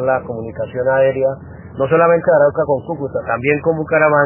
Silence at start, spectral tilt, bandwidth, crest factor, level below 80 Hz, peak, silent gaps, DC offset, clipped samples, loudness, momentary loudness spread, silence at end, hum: 0 s; -11 dB/octave; 3.2 kHz; 16 dB; -44 dBFS; 0 dBFS; none; under 0.1%; under 0.1%; -16 LUFS; 12 LU; 0 s; none